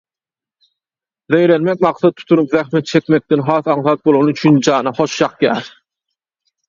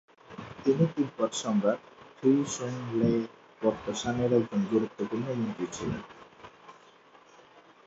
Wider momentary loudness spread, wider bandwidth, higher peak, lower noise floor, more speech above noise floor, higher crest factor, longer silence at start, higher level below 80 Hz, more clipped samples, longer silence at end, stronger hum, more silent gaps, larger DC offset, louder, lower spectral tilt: second, 5 LU vs 19 LU; second, 7.4 kHz vs 8.2 kHz; first, 0 dBFS vs -12 dBFS; first, under -90 dBFS vs -57 dBFS; first, over 76 dB vs 28 dB; about the same, 16 dB vs 18 dB; first, 1.3 s vs 0.3 s; about the same, -58 dBFS vs -60 dBFS; neither; second, 1 s vs 1.15 s; neither; neither; neither; first, -14 LUFS vs -29 LUFS; about the same, -6 dB/octave vs -6 dB/octave